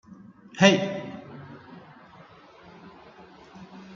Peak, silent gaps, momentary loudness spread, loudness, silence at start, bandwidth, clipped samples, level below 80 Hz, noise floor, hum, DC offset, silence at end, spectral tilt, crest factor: -2 dBFS; none; 29 LU; -22 LUFS; 0.1 s; 7.6 kHz; under 0.1%; -68 dBFS; -51 dBFS; none; under 0.1%; 0 s; -4.5 dB/octave; 26 dB